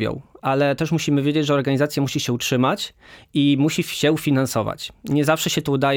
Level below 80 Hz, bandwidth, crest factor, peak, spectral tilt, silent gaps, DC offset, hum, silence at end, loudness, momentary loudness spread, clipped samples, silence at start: -54 dBFS; 20 kHz; 16 dB; -4 dBFS; -5 dB/octave; none; under 0.1%; none; 0 s; -21 LUFS; 8 LU; under 0.1%; 0 s